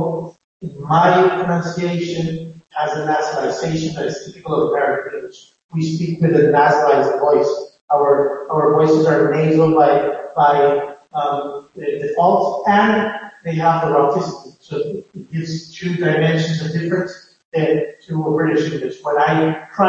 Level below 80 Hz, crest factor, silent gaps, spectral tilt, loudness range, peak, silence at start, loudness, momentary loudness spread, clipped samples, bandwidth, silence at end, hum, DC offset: -58 dBFS; 16 dB; 0.44-0.60 s, 5.64-5.69 s, 7.81-7.88 s, 17.45-17.52 s; -7 dB/octave; 6 LU; -2 dBFS; 0 s; -17 LUFS; 14 LU; under 0.1%; 7.6 kHz; 0 s; none; under 0.1%